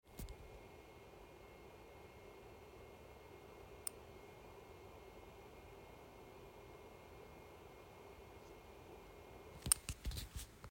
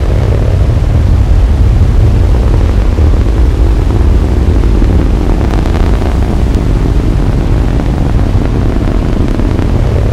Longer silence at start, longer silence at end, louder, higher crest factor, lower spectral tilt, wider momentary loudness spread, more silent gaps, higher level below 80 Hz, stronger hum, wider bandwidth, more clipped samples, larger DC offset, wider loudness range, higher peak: about the same, 0.05 s vs 0 s; about the same, 0 s vs 0 s; second, -50 LUFS vs -11 LUFS; first, 40 dB vs 8 dB; second, -2.5 dB/octave vs -8 dB/octave; first, 11 LU vs 3 LU; neither; second, -60 dBFS vs -10 dBFS; neither; first, 16.5 kHz vs 9.6 kHz; second, under 0.1% vs 1%; neither; first, 13 LU vs 2 LU; second, -12 dBFS vs 0 dBFS